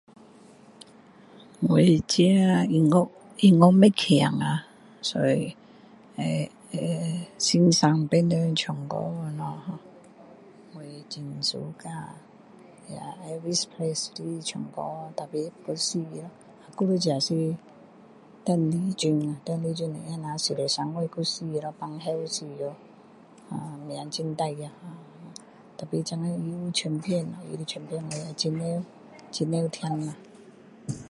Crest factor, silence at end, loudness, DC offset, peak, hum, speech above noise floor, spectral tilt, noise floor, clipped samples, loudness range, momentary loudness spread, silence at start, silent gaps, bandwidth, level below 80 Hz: 24 dB; 0 s; -26 LUFS; under 0.1%; -2 dBFS; none; 27 dB; -5.5 dB/octave; -52 dBFS; under 0.1%; 13 LU; 19 LU; 1.35 s; none; 11.5 kHz; -66 dBFS